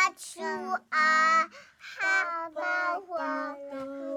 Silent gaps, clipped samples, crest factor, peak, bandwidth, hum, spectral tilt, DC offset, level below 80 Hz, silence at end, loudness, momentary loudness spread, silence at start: none; under 0.1%; 16 dB; -14 dBFS; 17.5 kHz; none; -1.5 dB/octave; under 0.1%; -82 dBFS; 0 s; -28 LUFS; 16 LU; 0 s